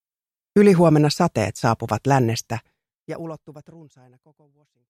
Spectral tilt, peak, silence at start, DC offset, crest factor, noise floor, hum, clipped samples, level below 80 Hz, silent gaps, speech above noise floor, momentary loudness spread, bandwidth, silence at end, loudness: -6.5 dB/octave; -4 dBFS; 0.55 s; under 0.1%; 18 dB; under -90 dBFS; none; under 0.1%; -56 dBFS; 3.00-3.04 s; over 69 dB; 19 LU; 15 kHz; 1.3 s; -19 LUFS